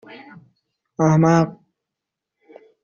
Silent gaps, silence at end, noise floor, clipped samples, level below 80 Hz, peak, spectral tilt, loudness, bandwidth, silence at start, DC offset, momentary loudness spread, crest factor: none; 1.3 s; -84 dBFS; under 0.1%; -58 dBFS; -4 dBFS; -8 dB/octave; -17 LUFS; 7.2 kHz; 0.1 s; under 0.1%; 23 LU; 18 dB